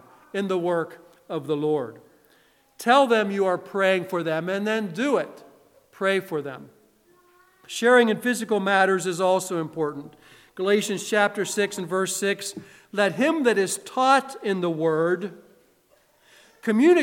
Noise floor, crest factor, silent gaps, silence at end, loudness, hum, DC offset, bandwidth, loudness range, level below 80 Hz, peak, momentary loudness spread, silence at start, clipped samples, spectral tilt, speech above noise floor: -62 dBFS; 20 dB; none; 0 s; -23 LUFS; none; under 0.1%; 17 kHz; 3 LU; -76 dBFS; -4 dBFS; 14 LU; 0.35 s; under 0.1%; -4 dB/octave; 39 dB